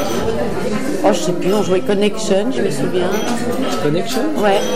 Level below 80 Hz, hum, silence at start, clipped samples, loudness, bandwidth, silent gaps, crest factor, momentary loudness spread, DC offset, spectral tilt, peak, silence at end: -42 dBFS; none; 0 s; under 0.1%; -17 LUFS; 16 kHz; none; 16 dB; 4 LU; 8%; -5 dB/octave; 0 dBFS; 0 s